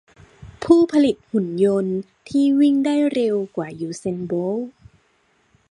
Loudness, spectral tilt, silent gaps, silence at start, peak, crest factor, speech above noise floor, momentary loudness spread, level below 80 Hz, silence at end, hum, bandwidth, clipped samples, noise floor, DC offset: -20 LUFS; -7 dB/octave; none; 0.4 s; -2 dBFS; 18 dB; 43 dB; 12 LU; -56 dBFS; 1 s; none; 10.5 kHz; under 0.1%; -62 dBFS; under 0.1%